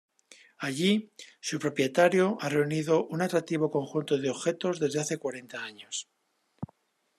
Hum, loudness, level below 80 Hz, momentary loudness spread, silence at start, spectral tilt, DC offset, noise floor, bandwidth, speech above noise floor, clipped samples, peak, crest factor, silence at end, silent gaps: none; -29 LUFS; -76 dBFS; 15 LU; 0.6 s; -5 dB/octave; under 0.1%; -74 dBFS; 13.5 kHz; 45 dB; under 0.1%; -10 dBFS; 20 dB; 0.55 s; none